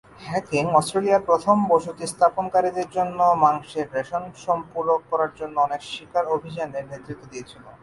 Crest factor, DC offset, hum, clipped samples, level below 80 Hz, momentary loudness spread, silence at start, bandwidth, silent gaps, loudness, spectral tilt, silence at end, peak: 18 dB; under 0.1%; none; under 0.1%; -60 dBFS; 14 LU; 0.2 s; 11.5 kHz; none; -23 LUFS; -5.5 dB/octave; 0.1 s; -4 dBFS